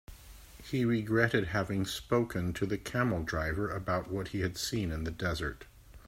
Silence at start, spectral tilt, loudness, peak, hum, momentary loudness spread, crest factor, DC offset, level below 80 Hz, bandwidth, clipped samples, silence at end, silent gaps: 0.1 s; -5.5 dB/octave; -33 LUFS; -12 dBFS; none; 10 LU; 22 dB; under 0.1%; -50 dBFS; 16 kHz; under 0.1%; 0.05 s; none